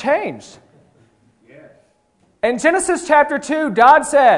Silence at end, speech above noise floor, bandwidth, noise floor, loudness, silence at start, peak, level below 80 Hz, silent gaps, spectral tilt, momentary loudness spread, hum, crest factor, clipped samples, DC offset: 0 s; 45 dB; 11 kHz; -60 dBFS; -15 LUFS; 0 s; 0 dBFS; -56 dBFS; none; -3.5 dB/octave; 11 LU; none; 16 dB; under 0.1%; under 0.1%